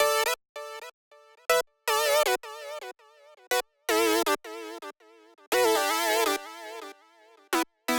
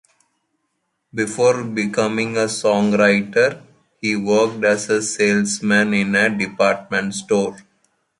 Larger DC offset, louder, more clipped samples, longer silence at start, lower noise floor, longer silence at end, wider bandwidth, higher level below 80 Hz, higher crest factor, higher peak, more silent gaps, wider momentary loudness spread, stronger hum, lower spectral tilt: neither; second, -26 LUFS vs -18 LUFS; neither; second, 0 s vs 1.15 s; second, -58 dBFS vs -72 dBFS; second, 0 s vs 0.6 s; first, 19.5 kHz vs 11.5 kHz; second, -74 dBFS vs -60 dBFS; about the same, 20 dB vs 18 dB; second, -8 dBFS vs -2 dBFS; first, 0.49-0.55 s, 0.93-1.11 s, 5.47-5.52 s vs none; first, 18 LU vs 7 LU; neither; second, -0.5 dB/octave vs -4.5 dB/octave